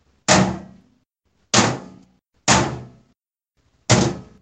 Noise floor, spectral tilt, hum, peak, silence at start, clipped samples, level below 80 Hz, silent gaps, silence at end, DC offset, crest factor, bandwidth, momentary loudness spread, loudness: -71 dBFS; -3.5 dB/octave; none; 0 dBFS; 0.3 s; under 0.1%; -44 dBFS; none; 0.2 s; under 0.1%; 22 dB; 9.4 kHz; 17 LU; -18 LUFS